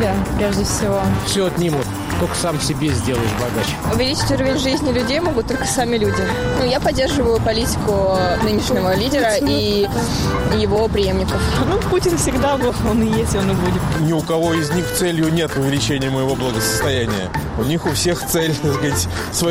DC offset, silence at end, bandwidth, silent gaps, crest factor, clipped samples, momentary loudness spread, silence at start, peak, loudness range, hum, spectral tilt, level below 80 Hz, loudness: under 0.1%; 0 s; 16 kHz; none; 10 dB; under 0.1%; 3 LU; 0 s; -6 dBFS; 2 LU; none; -5 dB/octave; -30 dBFS; -18 LUFS